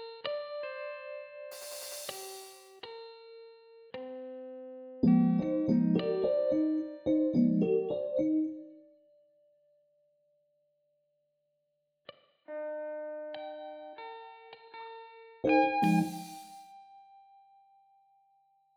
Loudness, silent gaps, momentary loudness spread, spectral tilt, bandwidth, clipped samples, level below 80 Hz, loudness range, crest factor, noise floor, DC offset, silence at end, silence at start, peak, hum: -31 LUFS; none; 22 LU; -6.5 dB/octave; over 20 kHz; under 0.1%; -70 dBFS; 15 LU; 20 dB; -80 dBFS; under 0.1%; 1.6 s; 0 s; -14 dBFS; none